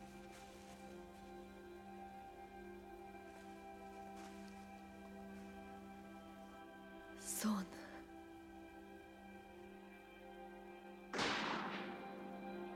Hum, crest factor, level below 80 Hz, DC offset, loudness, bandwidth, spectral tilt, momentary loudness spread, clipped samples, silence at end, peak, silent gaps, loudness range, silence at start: none; 22 dB; -72 dBFS; under 0.1%; -50 LUFS; 16.5 kHz; -3.5 dB/octave; 15 LU; under 0.1%; 0 s; -28 dBFS; none; 9 LU; 0 s